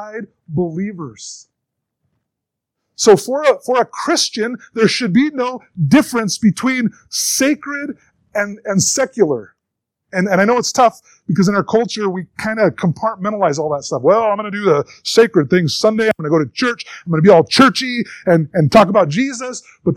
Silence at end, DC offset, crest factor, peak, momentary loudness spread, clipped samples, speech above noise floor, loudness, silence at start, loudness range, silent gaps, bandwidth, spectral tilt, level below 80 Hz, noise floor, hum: 0 s; under 0.1%; 16 dB; 0 dBFS; 13 LU; 0.1%; 65 dB; -15 LUFS; 0 s; 5 LU; none; 17 kHz; -4.5 dB/octave; -54 dBFS; -80 dBFS; none